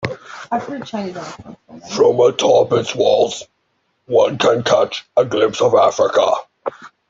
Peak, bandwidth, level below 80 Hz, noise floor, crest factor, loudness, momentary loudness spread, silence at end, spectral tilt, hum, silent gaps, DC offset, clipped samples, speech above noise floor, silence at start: -2 dBFS; 7.8 kHz; -58 dBFS; -66 dBFS; 14 dB; -16 LUFS; 16 LU; 0.25 s; -4.5 dB/octave; none; none; under 0.1%; under 0.1%; 51 dB; 0 s